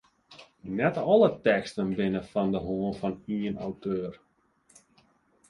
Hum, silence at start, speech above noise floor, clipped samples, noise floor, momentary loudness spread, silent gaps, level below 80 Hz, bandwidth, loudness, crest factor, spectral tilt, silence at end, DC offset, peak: none; 0.3 s; 38 dB; under 0.1%; -65 dBFS; 12 LU; none; -58 dBFS; 11 kHz; -28 LUFS; 20 dB; -7.5 dB/octave; 1.35 s; under 0.1%; -8 dBFS